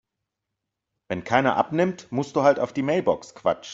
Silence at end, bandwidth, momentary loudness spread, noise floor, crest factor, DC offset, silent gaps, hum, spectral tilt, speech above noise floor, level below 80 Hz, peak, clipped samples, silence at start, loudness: 0 s; 8 kHz; 7 LU; -83 dBFS; 22 dB; under 0.1%; none; none; -6 dB/octave; 60 dB; -64 dBFS; -4 dBFS; under 0.1%; 1.1 s; -24 LUFS